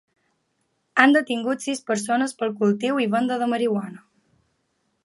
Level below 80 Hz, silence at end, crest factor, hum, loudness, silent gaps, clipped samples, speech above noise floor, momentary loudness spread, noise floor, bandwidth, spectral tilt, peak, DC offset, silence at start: -74 dBFS; 1.05 s; 22 dB; none; -22 LUFS; none; under 0.1%; 50 dB; 9 LU; -72 dBFS; 11.5 kHz; -4.5 dB/octave; 0 dBFS; under 0.1%; 0.95 s